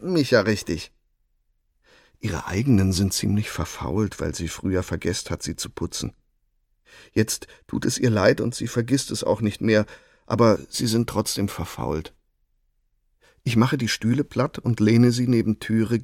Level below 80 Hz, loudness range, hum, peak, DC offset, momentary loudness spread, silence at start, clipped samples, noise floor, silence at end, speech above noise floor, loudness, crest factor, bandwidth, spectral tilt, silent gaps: -46 dBFS; 6 LU; none; -4 dBFS; under 0.1%; 11 LU; 0 s; under 0.1%; -68 dBFS; 0 s; 46 dB; -23 LUFS; 20 dB; 16.5 kHz; -5.5 dB/octave; none